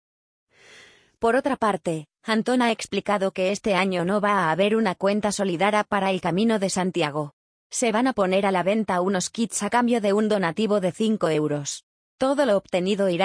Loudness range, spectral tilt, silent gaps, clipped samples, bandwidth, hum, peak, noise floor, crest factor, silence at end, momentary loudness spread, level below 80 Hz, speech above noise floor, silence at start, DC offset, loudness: 1 LU; -4.5 dB/octave; 7.33-7.70 s, 11.83-12.18 s; under 0.1%; 10.5 kHz; none; -6 dBFS; -52 dBFS; 16 dB; 0 s; 5 LU; -62 dBFS; 29 dB; 1.2 s; under 0.1%; -23 LUFS